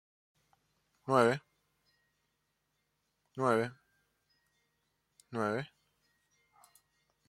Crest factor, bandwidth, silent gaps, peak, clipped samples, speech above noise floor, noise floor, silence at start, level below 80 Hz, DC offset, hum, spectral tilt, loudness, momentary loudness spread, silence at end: 26 dB; 14 kHz; none; -12 dBFS; under 0.1%; 51 dB; -81 dBFS; 1.05 s; -80 dBFS; under 0.1%; none; -6 dB/octave; -33 LUFS; 20 LU; 1.6 s